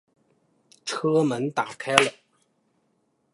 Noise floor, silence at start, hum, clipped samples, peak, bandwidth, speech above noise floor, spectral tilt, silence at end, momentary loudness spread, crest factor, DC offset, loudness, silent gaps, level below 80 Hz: -70 dBFS; 0.85 s; none; under 0.1%; 0 dBFS; 16 kHz; 47 dB; -4 dB/octave; 1.25 s; 10 LU; 28 dB; under 0.1%; -24 LUFS; none; -68 dBFS